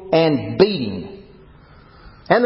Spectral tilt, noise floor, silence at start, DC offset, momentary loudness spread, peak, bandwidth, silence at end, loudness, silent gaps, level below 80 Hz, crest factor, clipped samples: -10.5 dB/octave; -46 dBFS; 0 s; under 0.1%; 15 LU; 0 dBFS; 5.8 kHz; 0 s; -18 LUFS; none; -48 dBFS; 20 dB; under 0.1%